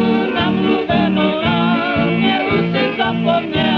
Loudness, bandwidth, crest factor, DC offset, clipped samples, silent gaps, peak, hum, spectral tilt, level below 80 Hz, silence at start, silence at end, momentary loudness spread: -16 LUFS; 6 kHz; 10 dB; under 0.1%; under 0.1%; none; -4 dBFS; none; -8 dB/octave; -46 dBFS; 0 s; 0 s; 2 LU